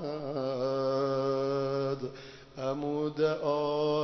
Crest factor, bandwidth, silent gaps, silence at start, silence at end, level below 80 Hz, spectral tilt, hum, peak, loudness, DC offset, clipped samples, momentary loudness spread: 14 dB; 6.4 kHz; none; 0 s; 0 s; -64 dBFS; -7 dB/octave; none; -18 dBFS; -31 LUFS; under 0.1%; under 0.1%; 8 LU